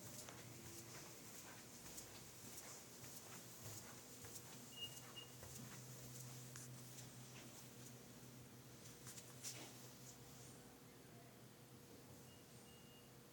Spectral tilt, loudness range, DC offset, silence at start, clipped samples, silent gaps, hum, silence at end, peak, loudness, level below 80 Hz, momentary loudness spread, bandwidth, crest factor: -3 dB/octave; 3 LU; under 0.1%; 0 s; under 0.1%; none; none; 0 s; -36 dBFS; -56 LUFS; -80 dBFS; 9 LU; over 20 kHz; 22 dB